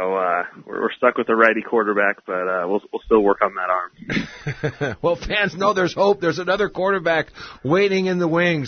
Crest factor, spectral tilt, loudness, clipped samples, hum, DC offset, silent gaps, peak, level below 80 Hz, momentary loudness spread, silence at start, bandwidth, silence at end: 20 dB; -6 dB/octave; -20 LUFS; under 0.1%; none; under 0.1%; none; 0 dBFS; -48 dBFS; 9 LU; 0 s; 6.6 kHz; 0 s